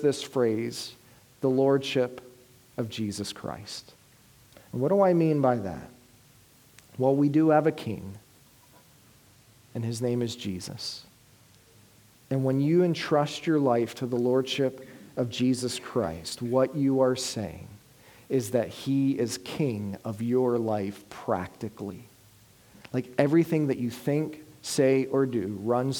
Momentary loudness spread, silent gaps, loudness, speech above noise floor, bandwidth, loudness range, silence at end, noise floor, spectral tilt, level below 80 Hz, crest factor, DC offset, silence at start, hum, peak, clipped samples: 15 LU; none; -27 LUFS; 31 dB; 19.5 kHz; 6 LU; 0 s; -57 dBFS; -6 dB/octave; -64 dBFS; 22 dB; under 0.1%; 0 s; none; -6 dBFS; under 0.1%